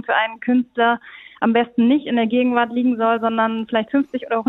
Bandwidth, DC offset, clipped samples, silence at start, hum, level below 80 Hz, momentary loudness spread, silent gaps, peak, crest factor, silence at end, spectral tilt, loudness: 4 kHz; under 0.1%; under 0.1%; 0.05 s; none; -64 dBFS; 5 LU; none; -2 dBFS; 16 dB; 0.05 s; -8 dB/octave; -19 LUFS